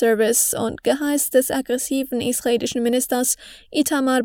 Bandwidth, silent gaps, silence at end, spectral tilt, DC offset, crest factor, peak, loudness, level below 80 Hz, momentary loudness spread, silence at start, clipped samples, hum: over 20 kHz; none; 0 s; -2.5 dB/octave; under 0.1%; 16 dB; -4 dBFS; -20 LUFS; -56 dBFS; 6 LU; 0 s; under 0.1%; none